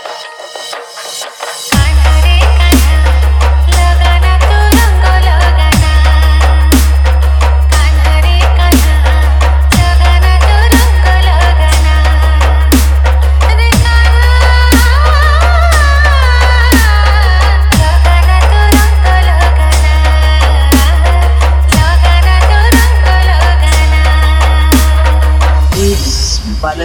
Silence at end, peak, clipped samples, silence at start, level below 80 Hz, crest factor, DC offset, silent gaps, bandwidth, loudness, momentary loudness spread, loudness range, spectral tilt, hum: 0 s; 0 dBFS; 0.6%; 0 s; -8 dBFS; 6 dB; under 0.1%; none; 18.5 kHz; -8 LUFS; 3 LU; 1 LU; -5 dB/octave; none